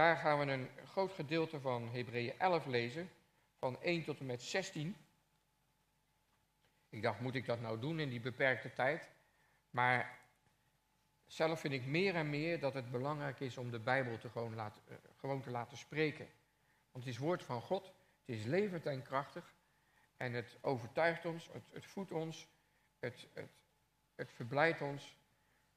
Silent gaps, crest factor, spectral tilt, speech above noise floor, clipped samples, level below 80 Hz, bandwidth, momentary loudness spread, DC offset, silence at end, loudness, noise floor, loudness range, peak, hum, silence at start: none; 24 dB; -6 dB/octave; 39 dB; under 0.1%; -82 dBFS; 15 kHz; 16 LU; under 0.1%; 0.65 s; -40 LUFS; -79 dBFS; 6 LU; -16 dBFS; none; 0 s